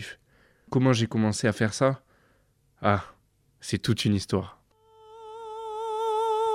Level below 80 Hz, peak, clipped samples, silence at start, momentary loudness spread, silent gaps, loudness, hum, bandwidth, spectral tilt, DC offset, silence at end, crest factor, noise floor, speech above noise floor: -60 dBFS; -8 dBFS; under 0.1%; 0 s; 18 LU; none; -27 LUFS; none; 15 kHz; -5.5 dB/octave; under 0.1%; 0 s; 20 dB; -66 dBFS; 41 dB